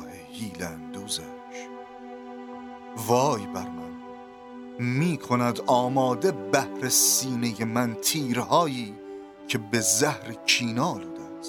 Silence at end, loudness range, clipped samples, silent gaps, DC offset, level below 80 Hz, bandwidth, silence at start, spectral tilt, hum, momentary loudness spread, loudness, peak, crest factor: 0 s; 7 LU; under 0.1%; none; under 0.1%; -66 dBFS; 19.5 kHz; 0 s; -3.5 dB/octave; none; 19 LU; -25 LUFS; -4 dBFS; 22 dB